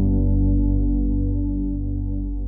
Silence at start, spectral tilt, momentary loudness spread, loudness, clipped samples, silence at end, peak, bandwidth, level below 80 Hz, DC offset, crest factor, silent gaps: 0 s; -17.5 dB/octave; 7 LU; -23 LUFS; under 0.1%; 0 s; -10 dBFS; 1 kHz; -22 dBFS; 0.1%; 10 dB; none